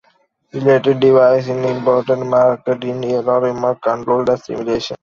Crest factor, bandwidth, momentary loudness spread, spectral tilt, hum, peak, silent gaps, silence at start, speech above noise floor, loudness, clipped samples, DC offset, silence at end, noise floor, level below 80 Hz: 14 dB; 7.2 kHz; 9 LU; -7 dB/octave; none; -2 dBFS; none; 0.55 s; 44 dB; -16 LUFS; under 0.1%; under 0.1%; 0.05 s; -59 dBFS; -54 dBFS